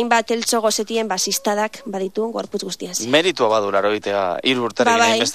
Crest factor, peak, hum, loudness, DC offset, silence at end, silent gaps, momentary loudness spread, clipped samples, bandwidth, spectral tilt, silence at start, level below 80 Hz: 18 dB; -2 dBFS; none; -19 LUFS; 0.3%; 0 s; none; 10 LU; under 0.1%; 15 kHz; -2.5 dB/octave; 0 s; -64 dBFS